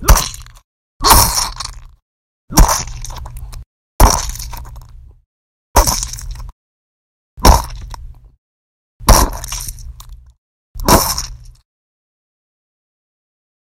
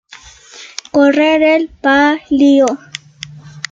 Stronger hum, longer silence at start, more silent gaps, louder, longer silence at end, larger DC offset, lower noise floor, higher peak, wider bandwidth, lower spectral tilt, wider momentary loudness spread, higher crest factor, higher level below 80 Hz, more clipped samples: neither; second, 0 s vs 0.55 s; first, 0.64-1.00 s, 2.02-2.48 s, 3.66-3.99 s, 5.26-5.74 s, 6.52-7.37 s, 8.38-9.00 s, 10.38-10.75 s vs none; about the same, -14 LUFS vs -12 LUFS; first, 2.25 s vs 0.1 s; neither; about the same, -36 dBFS vs -39 dBFS; about the same, 0 dBFS vs 0 dBFS; first, over 20 kHz vs 7.8 kHz; about the same, -3 dB/octave vs -4 dB/octave; first, 23 LU vs 20 LU; about the same, 16 dB vs 12 dB; first, -20 dBFS vs -50 dBFS; first, 0.4% vs under 0.1%